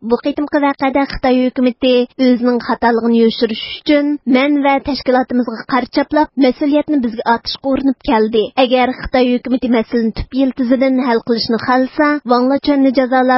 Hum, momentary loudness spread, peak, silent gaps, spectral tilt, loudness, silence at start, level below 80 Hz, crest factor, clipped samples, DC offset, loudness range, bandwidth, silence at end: none; 5 LU; 0 dBFS; none; -8.5 dB/octave; -14 LUFS; 0 s; -40 dBFS; 14 dB; under 0.1%; under 0.1%; 1 LU; 5.8 kHz; 0 s